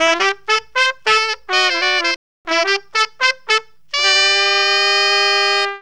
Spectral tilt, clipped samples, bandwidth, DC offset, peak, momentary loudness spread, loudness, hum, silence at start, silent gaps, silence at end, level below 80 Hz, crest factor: 1 dB/octave; under 0.1%; 12.5 kHz; 0.7%; 0 dBFS; 6 LU; -14 LUFS; none; 0 s; 2.16-2.45 s; 0 s; -62 dBFS; 16 dB